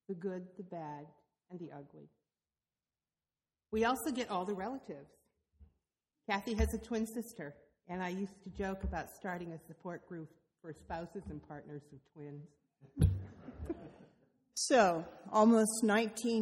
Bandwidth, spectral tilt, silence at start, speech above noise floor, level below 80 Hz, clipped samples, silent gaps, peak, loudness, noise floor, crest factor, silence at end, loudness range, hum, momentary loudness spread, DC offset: 16 kHz; -5 dB/octave; 0.1 s; over 54 dB; -50 dBFS; under 0.1%; none; -16 dBFS; -36 LUFS; under -90 dBFS; 22 dB; 0 s; 15 LU; none; 22 LU; under 0.1%